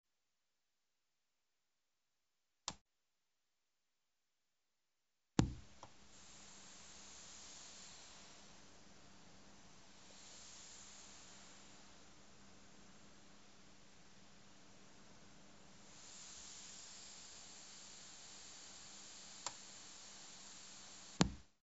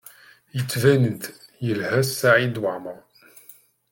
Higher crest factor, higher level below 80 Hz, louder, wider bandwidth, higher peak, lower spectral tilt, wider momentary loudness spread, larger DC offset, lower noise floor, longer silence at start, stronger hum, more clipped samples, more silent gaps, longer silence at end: first, 40 dB vs 20 dB; about the same, -64 dBFS vs -64 dBFS; second, -50 LUFS vs -22 LUFS; second, 8 kHz vs 17 kHz; second, -12 dBFS vs -4 dBFS; about the same, -4.5 dB/octave vs -5.5 dB/octave; about the same, 16 LU vs 17 LU; neither; first, under -90 dBFS vs -51 dBFS; second, 0.05 s vs 0.55 s; neither; neither; first, 2.81-2.86 s vs none; second, 0.1 s vs 0.95 s